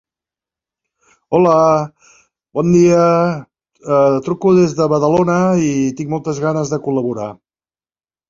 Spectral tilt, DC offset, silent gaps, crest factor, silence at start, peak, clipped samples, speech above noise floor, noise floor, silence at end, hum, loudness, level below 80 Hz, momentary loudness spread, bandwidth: -7 dB/octave; under 0.1%; none; 16 dB; 1.3 s; 0 dBFS; under 0.1%; over 76 dB; under -90 dBFS; 0.95 s; none; -14 LUFS; -52 dBFS; 12 LU; 7.6 kHz